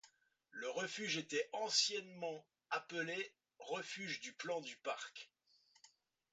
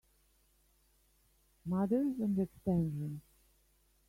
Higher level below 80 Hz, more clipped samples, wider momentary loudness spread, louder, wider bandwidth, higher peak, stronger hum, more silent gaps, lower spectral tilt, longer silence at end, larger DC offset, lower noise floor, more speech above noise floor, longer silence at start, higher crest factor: second, under -90 dBFS vs -64 dBFS; neither; first, 16 LU vs 12 LU; second, -42 LUFS vs -35 LUFS; second, 9 kHz vs 16 kHz; about the same, -22 dBFS vs -20 dBFS; neither; neither; second, -1.5 dB/octave vs -10 dB/octave; second, 0.45 s vs 0.9 s; neither; about the same, -74 dBFS vs -71 dBFS; second, 31 dB vs 38 dB; second, 0.05 s vs 1.65 s; first, 24 dB vs 18 dB